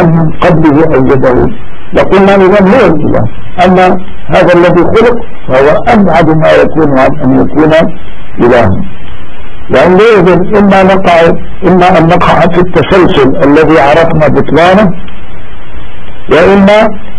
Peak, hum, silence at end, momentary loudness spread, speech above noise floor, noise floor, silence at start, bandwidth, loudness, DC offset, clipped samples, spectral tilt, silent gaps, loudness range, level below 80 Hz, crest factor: 0 dBFS; none; 0 s; 7 LU; 21 dB; -25 dBFS; 0 s; 11 kHz; -5 LUFS; 30%; 9%; -7.5 dB/octave; none; 2 LU; -24 dBFS; 6 dB